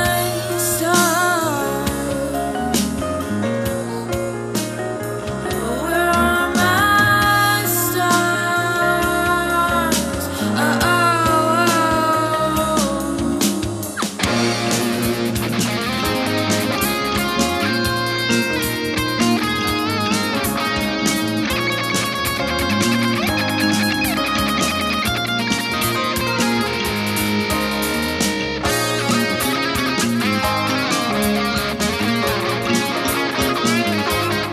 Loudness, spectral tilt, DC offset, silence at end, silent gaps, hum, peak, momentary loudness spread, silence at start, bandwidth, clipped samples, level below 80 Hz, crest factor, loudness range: -18 LUFS; -3.5 dB/octave; under 0.1%; 0 s; none; none; -2 dBFS; 6 LU; 0 s; 14 kHz; under 0.1%; -38 dBFS; 16 dB; 4 LU